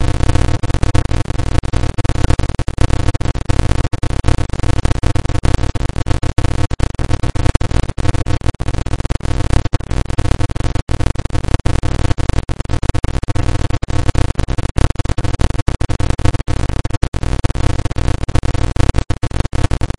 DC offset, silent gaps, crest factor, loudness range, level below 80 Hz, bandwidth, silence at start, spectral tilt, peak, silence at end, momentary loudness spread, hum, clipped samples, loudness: under 0.1%; 10.82-10.87 s, 14.71-14.75 s, 15.62-15.66 s, 16.97-17.01 s, 17.08-17.12 s; 14 dB; 1 LU; -18 dBFS; 11.5 kHz; 0 s; -6 dB/octave; 0 dBFS; 0.15 s; 4 LU; none; under 0.1%; -19 LUFS